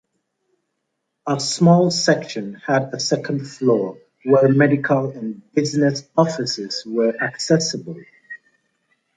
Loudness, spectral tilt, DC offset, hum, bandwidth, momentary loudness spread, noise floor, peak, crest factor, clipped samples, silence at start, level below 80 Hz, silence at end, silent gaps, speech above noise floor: -19 LUFS; -5 dB/octave; under 0.1%; none; 9.4 kHz; 16 LU; -76 dBFS; -2 dBFS; 18 dB; under 0.1%; 1.25 s; -66 dBFS; 0.8 s; none; 57 dB